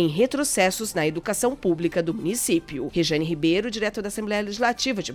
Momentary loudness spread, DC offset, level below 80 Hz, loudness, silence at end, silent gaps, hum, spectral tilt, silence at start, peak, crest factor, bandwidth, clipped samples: 5 LU; under 0.1%; -50 dBFS; -24 LUFS; 0 s; none; none; -4 dB/octave; 0 s; -8 dBFS; 16 dB; 18 kHz; under 0.1%